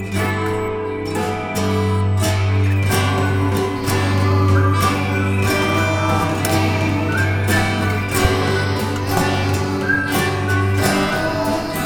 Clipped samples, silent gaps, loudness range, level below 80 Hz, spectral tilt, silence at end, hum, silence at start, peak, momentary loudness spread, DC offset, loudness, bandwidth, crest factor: under 0.1%; none; 2 LU; -38 dBFS; -5.5 dB/octave; 0 s; none; 0 s; -2 dBFS; 4 LU; under 0.1%; -18 LUFS; 19.5 kHz; 16 dB